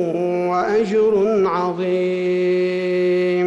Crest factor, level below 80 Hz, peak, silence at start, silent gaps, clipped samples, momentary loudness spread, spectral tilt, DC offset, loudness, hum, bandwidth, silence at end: 8 dB; -60 dBFS; -10 dBFS; 0 s; none; under 0.1%; 4 LU; -7.5 dB/octave; under 0.1%; -19 LUFS; none; 8 kHz; 0 s